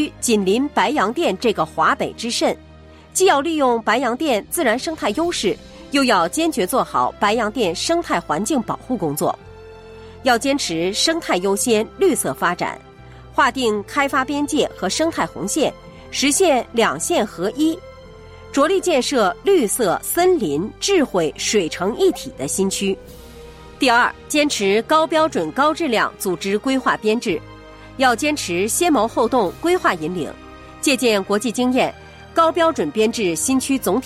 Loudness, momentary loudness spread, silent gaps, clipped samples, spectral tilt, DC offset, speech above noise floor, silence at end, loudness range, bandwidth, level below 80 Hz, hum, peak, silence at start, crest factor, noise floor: -19 LUFS; 7 LU; none; under 0.1%; -3 dB/octave; under 0.1%; 23 dB; 0 s; 2 LU; 16 kHz; -48 dBFS; none; -4 dBFS; 0 s; 16 dB; -41 dBFS